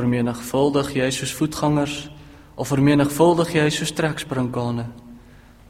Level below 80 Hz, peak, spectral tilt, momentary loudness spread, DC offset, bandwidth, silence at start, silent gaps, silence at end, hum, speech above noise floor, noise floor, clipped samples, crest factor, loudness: -48 dBFS; -4 dBFS; -5.5 dB/octave; 13 LU; under 0.1%; 16.5 kHz; 0 s; none; 0.5 s; none; 26 dB; -47 dBFS; under 0.1%; 18 dB; -21 LUFS